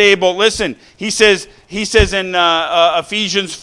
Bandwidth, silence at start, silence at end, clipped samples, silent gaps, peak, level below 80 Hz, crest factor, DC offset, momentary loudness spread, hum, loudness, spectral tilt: 12 kHz; 0 s; 0 s; 0.1%; none; 0 dBFS; -30 dBFS; 14 dB; under 0.1%; 10 LU; none; -13 LUFS; -3 dB/octave